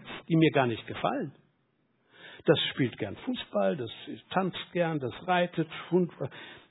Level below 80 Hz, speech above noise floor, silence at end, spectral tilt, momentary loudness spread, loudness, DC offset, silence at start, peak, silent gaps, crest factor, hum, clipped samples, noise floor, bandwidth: -68 dBFS; 43 dB; 0.1 s; -9.5 dB/octave; 14 LU; -30 LUFS; under 0.1%; 0 s; -10 dBFS; none; 22 dB; none; under 0.1%; -72 dBFS; 4.1 kHz